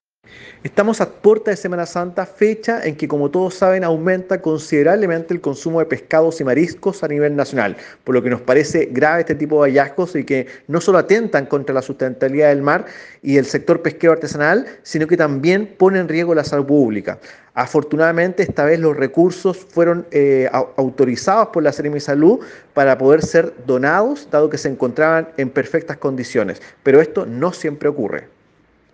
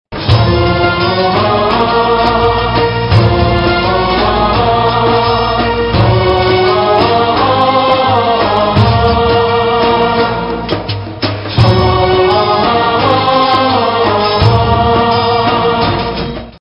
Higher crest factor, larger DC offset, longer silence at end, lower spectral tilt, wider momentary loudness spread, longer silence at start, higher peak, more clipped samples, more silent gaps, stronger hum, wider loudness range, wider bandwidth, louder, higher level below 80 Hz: first, 16 dB vs 10 dB; neither; first, 0.75 s vs 0.05 s; second, -6.5 dB/octave vs -8 dB/octave; first, 8 LU vs 3 LU; first, 0.35 s vs 0.1 s; about the same, 0 dBFS vs 0 dBFS; second, under 0.1% vs 0.2%; neither; neither; about the same, 3 LU vs 2 LU; first, 9.4 kHz vs 6.2 kHz; second, -16 LUFS vs -11 LUFS; second, -58 dBFS vs -26 dBFS